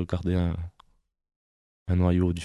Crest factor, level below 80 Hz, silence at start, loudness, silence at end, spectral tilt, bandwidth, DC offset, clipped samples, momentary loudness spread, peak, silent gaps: 16 dB; -36 dBFS; 0 s; -27 LUFS; 0 s; -8.5 dB/octave; 11 kHz; under 0.1%; under 0.1%; 17 LU; -12 dBFS; 1.36-1.86 s